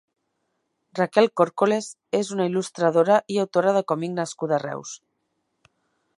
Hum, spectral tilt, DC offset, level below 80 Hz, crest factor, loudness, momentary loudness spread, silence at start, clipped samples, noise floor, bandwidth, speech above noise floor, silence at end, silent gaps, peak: none; -5.5 dB/octave; under 0.1%; -76 dBFS; 22 dB; -23 LUFS; 12 LU; 0.95 s; under 0.1%; -75 dBFS; 11.5 kHz; 53 dB; 1.25 s; none; -2 dBFS